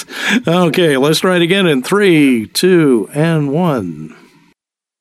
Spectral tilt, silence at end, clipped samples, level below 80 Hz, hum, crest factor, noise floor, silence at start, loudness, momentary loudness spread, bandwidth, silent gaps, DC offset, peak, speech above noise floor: -5.5 dB/octave; 0.95 s; under 0.1%; -60 dBFS; none; 12 dB; -63 dBFS; 0 s; -12 LUFS; 5 LU; 15 kHz; none; under 0.1%; -2 dBFS; 51 dB